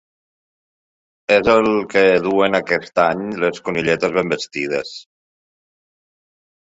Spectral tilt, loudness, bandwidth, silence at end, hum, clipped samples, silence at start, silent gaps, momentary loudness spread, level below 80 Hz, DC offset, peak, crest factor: -5 dB/octave; -17 LUFS; 8 kHz; 1.65 s; none; under 0.1%; 1.3 s; none; 9 LU; -52 dBFS; under 0.1%; -2 dBFS; 18 dB